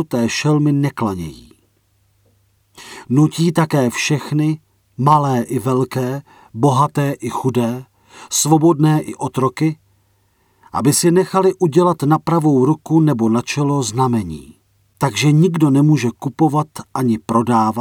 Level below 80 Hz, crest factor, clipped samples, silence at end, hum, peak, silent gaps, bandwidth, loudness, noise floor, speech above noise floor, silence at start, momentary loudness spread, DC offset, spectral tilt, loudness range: -54 dBFS; 16 dB; under 0.1%; 0 s; none; 0 dBFS; none; 17 kHz; -16 LUFS; -60 dBFS; 44 dB; 0 s; 9 LU; under 0.1%; -6 dB/octave; 4 LU